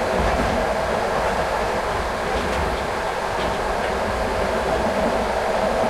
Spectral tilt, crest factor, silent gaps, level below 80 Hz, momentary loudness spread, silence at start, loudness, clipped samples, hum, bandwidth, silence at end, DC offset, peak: -4.5 dB/octave; 14 dB; none; -34 dBFS; 3 LU; 0 s; -22 LUFS; under 0.1%; none; 16 kHz; 0 s; under 0.1%; -8 dBFS